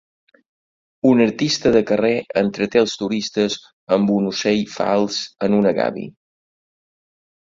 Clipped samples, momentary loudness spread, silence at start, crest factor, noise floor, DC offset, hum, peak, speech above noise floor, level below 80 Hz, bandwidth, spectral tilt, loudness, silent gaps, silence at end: under 0.1%; 7 LU; 1.05 s; 18 dB; under -90 dBFS; under 0.1%; none; -2 dBFS; over 72 dB; -56 dBFS; 7.6 kHz; -5 dB/octave; -19 LUFS; 3.73-3.87 s; 1.5 s